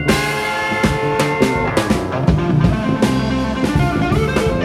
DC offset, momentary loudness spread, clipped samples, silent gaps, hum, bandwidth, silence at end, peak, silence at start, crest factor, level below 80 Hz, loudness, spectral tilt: under 0.1%; 3 LU; under 0.1%; none; none; 15.5 kHz; 0 s; 0 dBFS; 0 s; 16 dB; -28 dBFS; -17 LUFS; -6 dB/octave